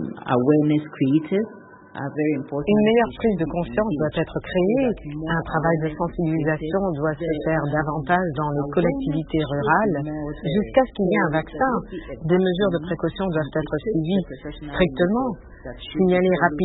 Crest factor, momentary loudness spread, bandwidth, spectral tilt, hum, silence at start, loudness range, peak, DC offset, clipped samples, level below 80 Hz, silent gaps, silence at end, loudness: 18 dB; 10 LU; 4.1 kHz; -12 dB/octave; none; 0 s; 2 LU; -4 dBFS; under 0.1%; under 0.1%; -44 dBFS; none; 0 s; -22 LUFS